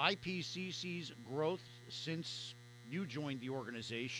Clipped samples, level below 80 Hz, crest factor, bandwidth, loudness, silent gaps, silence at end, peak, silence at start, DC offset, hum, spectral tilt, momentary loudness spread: under 0.1%; -78 dBFS; 26 dB; over 20 kHz; -43 LUFS; none; 0 s; -18 dBFS; 0 s; under 0.1%; none; -4.5 dB/octave; 7 LU